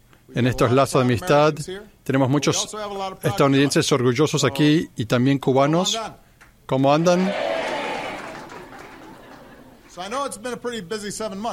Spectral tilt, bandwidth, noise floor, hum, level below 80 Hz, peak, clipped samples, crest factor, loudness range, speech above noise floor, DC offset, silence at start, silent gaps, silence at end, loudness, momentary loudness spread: -5 dB/octave; 16 kHz; -46 dBFS; none; -50 dBFS; -4 dBFS; under 0.1%; 16 dB; 11 LU; 26 dB; under 0.1%; 0.3 s; none; 0 s; -21 LUFS; 16 LU